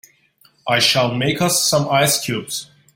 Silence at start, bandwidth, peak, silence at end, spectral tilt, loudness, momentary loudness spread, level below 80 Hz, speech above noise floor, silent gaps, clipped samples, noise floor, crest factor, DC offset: 0.65 s; 16.5 kHz; -2 dBFS; 0.3 s; -3 dB/octave; -16 LUFS; 12 LU; -56 dBFS; 38 dB; none; under 0.1%; -56 dBFS; 18 dB; under 0.1%